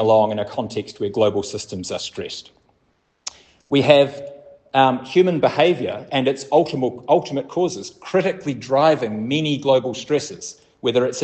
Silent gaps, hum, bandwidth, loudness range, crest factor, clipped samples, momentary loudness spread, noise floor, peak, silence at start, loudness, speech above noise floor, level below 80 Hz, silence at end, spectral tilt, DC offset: none; none; 8.8 kHz; 5 LU; 20 dB; under 0.1%; 15 LU; -65 dBFS; 0 dBFS; 0 s; -20 LUFS; 46 dB; -62 dBFS; 0 s; -5 dB/octave; under 0.1%